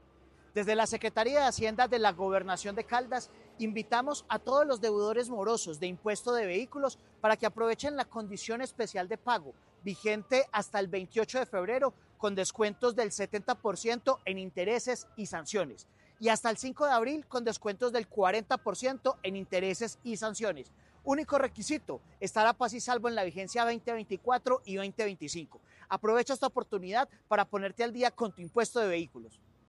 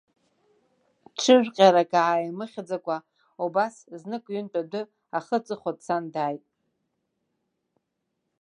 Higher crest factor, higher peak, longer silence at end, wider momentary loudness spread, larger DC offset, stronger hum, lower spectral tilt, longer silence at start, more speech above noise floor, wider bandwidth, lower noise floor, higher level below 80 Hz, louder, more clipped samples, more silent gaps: second, 18 dB vs 24 dB; second, -14 dBFS vs -4 dBFS; second, 0.4 s vs 2.05 s; second, 8 LU vs 17 LU; neither; neither; about the same, -3.5 dB/octave vs -4.5 dB/octave; second, 0.55 s vs 1.2 s; second, 29 dB vs 55 dB; first, 12 kHz vs 10.5 kHz; second, -61 dBFS vs -80 dBFS; first, -66 dBFS vs -82 dBFS; second, -32 LUFS vs -25 LUFS; neither; neither